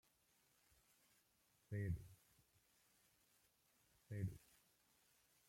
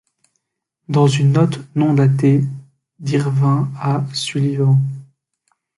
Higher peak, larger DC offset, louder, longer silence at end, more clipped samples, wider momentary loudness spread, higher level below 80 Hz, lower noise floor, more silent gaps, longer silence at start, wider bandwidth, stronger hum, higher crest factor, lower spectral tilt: second, -34 dBFS vs -2 dBFS; neither; second, -50 LUFS vs -17 LUFS; first, 1.1 s vs 0.75 s; neither; first, 16 LU vs 11 LU; second, -72 dBFS vs -58 dBFS; about the same, -80 dBFS vs -77 dBFS; neither; first, 1.7 s vs 0.9 s; first, 16.5 kHz vs 11.5 kHz; neither; first, 22 dB vs 14 dB; about the same, -7.5 dB/octave vs -7 dB/octave